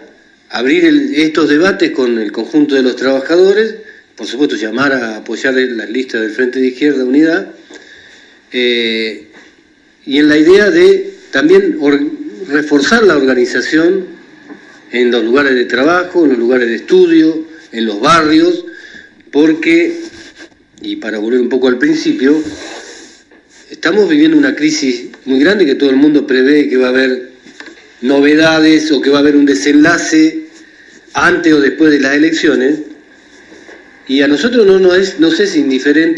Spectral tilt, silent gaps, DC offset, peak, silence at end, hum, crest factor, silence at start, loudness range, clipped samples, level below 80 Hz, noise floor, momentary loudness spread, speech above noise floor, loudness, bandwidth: -4.5 dB/octave; none; under 0.1%; 0 dBFS; 0 s; none; 12 dB; 0.5 s; 5 LU; 0.3%; -52 dBFS; -47 dBFS; 12 LU; 37 dB; -10 LUFS; 10 kHz